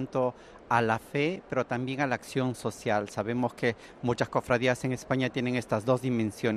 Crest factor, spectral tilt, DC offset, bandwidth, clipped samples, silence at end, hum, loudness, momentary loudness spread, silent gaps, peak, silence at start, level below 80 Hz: 20 dB; -6 dB/octave; under 0.1%; 13.5 kHz; under 0.1%; 0 s; none; -30 LUFS; 6 LU; none; -8 dBFS; 0 s; -60 dBFS